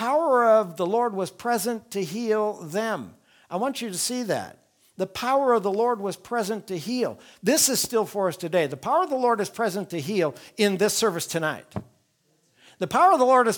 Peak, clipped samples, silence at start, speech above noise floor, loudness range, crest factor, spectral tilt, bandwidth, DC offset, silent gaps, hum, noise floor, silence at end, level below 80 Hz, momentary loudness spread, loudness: -6 dBFS; under 0.1%; 0 s; 43 dB; 4 LU; 18 dB; -3.5 dB/octave; 19.5 kHz; under 0.1%; none; none; -67 dBFS; 0 s; -68 dBFS; 11 LU; -24 LUFS